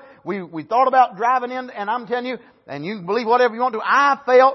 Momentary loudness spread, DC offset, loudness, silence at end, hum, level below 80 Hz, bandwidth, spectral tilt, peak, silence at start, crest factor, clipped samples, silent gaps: 14 LU; under 0.1%; -19 LUFS; 0 s; none; -74 dBFS; 6.2 kHz; -5 dB/octave; -4 dBFS; 0.25 s; 16 dB; under 0.1%; none